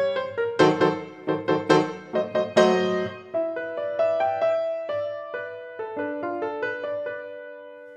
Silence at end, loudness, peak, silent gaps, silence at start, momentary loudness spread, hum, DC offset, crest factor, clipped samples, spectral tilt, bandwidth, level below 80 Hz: 0 s; -25 LUFS; -4 dBFS; none; 0 s; 14 LU; none; under 0.1%; 22 dB; under 0.1%; -5.5 dB/octave; 9.8 kHz; -72 dBFS